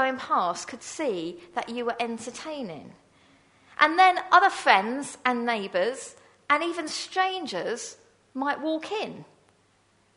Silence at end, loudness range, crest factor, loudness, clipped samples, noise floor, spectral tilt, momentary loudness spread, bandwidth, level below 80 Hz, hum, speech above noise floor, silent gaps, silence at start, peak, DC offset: 0.95 s; 8 LU; 26 dB; -26 LUFS; under 0.1%; -64 dBFS; -2.5 dB/octave; 17 LU; 11 kHz; -74 dBFS; none; 38 dB; none; 0 s; -2 dBFS; under 0.1%